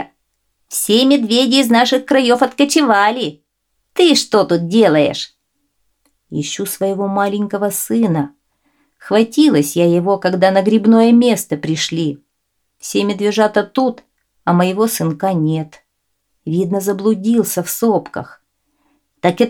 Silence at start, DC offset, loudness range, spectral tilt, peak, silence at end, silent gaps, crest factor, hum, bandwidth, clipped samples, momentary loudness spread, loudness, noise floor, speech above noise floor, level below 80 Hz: 0 s; under 0.1%; 6 LU; -4.5 dB/octave; 0 dBFS; 0 s; none; 14 dB; none; 18 kHz; under 0.1%; 12 LU; -15 LUFS; -71 dBFS; 57 dB; -64 dBFS